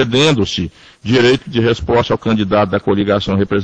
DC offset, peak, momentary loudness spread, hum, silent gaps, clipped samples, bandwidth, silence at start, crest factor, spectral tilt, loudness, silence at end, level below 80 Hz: under 0.1%; 0 dBFS; 6 LU; none; none; under 0.1%; 9 kHz; 0 s; 14 dB; -6 dB/octave; -14 LUFS; 0 s; -38 dBFS